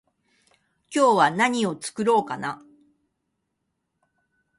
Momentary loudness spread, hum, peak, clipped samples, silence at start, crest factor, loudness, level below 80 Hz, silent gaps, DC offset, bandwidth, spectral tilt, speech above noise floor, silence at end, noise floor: 13 LU; none; -4 dBFS; under 0.1%; 0.9 s; 22 dB; -22 LUFS; -72 dBFS; none; under 0.1%; 11.5 kHz; -4 dB/octave; 56 dB; 2.05 s; -78 dBFS